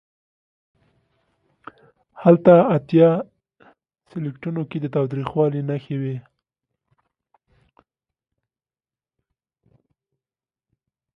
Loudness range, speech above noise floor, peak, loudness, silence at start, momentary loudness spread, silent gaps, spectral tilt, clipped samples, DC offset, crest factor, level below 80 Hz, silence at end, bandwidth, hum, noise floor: 10 LU; over 72 dB; 0 dBFS; -19 LUFS; 2.2 s; 17 LU; none; -11 dB/octave; under 0.1%; under 0.1%; 22 dB; -64 dBFS; 4.95 s; 5.4 kHz; none; under -90 dBFS